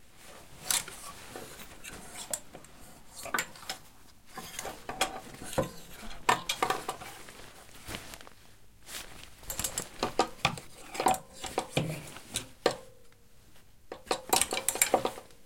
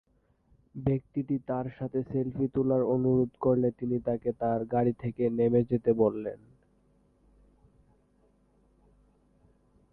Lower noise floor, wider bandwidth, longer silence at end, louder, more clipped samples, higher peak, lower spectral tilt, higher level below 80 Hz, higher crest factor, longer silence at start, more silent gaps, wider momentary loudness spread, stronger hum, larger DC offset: second, -58 dBFS vs -67 dBFS; first, 17 kHz vs 4 kHz; second, 0.1 s vs 3.55 s; second, -33 LUFS vs -29 LUFS; neither; first, -2 dBFS vs -12 dBFS; second, -2 dB/octave vs -12.5 dB/octave; about the same, -56 dBFS vs -58 dBFS; first, 34 dB vs 18 dB; second, 0.1 s vs 0.75 s; neither; first, 20 LU vs 8 LU; second, none vs 50 Hz at -65 dBFS; first, 0.2% vs under 0.1%